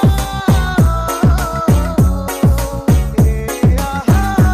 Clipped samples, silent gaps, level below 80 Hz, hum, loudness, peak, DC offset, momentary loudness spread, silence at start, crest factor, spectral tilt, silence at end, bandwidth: under 0.1%; none; -18 dBFS; none; -14 LUFS; -4 dBFS; 0.5%; 3 LU; 0 s; 10 dB; -6.5 dB/octave; 0 s; 15.5 kHz